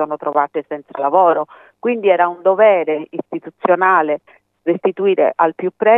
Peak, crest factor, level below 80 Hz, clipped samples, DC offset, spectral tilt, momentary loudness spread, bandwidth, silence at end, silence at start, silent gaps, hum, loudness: 0 dBFS; 16 dB; -80 dBFS; under 0.1%; under 0.1%; -8.5 dB/octave; 13 LU; 3.8 kHz; 0 s; 0 s; none; none; -16 LUFS